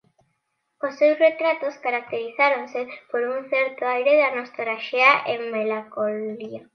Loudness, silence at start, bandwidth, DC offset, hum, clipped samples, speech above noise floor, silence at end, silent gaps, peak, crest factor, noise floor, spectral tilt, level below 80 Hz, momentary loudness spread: -22 LUFS; 0.85 s; 6.4 kHz; under 0.1%; none; under 0.1%; 52 dB; 0.15 s; none; -2 dBFS; 20 dB; -74 dBFS; -4.5 dB/octave; -82 dBFS; 13 LU